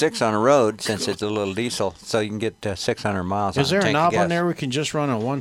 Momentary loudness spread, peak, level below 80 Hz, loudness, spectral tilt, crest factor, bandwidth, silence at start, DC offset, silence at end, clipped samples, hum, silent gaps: 7 LU; -4 dBFS; -54 dBFS; -22 LUFS; -5 dB/octave; 18 dB; 16 kHz; 0 s; under 0.1%; 0 s; under 0.1%; none; none